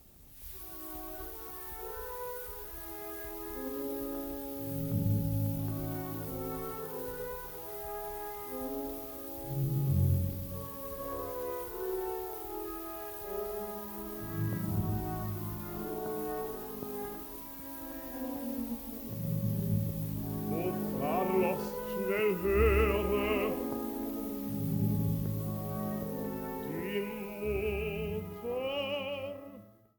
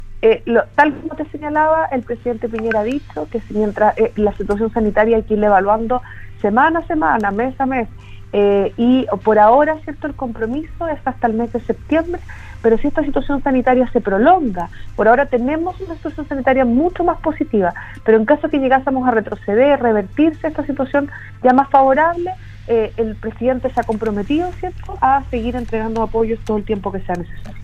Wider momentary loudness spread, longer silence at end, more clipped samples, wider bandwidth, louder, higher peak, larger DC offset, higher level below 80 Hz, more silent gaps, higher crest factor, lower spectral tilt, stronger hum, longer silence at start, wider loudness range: about the same, 10 LU vs 11 LU; first, 0.25 s vs 0 s; neither; first, over 20 kHz vs 8.8 kHz; second, -35 LUFS vs -17 LUFS; second, -16 dBFS vs 0 dBFS; neither; second, -48 dBFS vs -34 dBFS; neither; about the same, 20 dB vs 16 dB; second, -6.5 dB/octave vs -8 dB/octave; neither; about the same, 0 s vs 0 s; first, 8 LU vs 4 LU